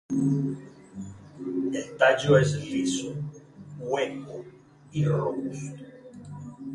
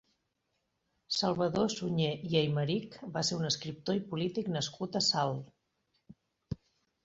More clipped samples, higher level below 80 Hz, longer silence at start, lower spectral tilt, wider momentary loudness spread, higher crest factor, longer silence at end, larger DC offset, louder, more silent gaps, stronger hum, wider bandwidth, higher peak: neither; about the same, -60 dBFS vs -64 dBFS; second, 0.1 s vs 1.1 s; first, -6 dB/octave vs -4.5 dB/octave; first, 22 LU vs 11 LU; about the same, 22 dB vs 20 dB; second, 0 s vs 0.5 s; neither; first, -26 LUFS vs -32 LUFS; neither; neither; first, 11.5 kHz vs 8 kHz; first, -6 dBFS vs -14 dBFS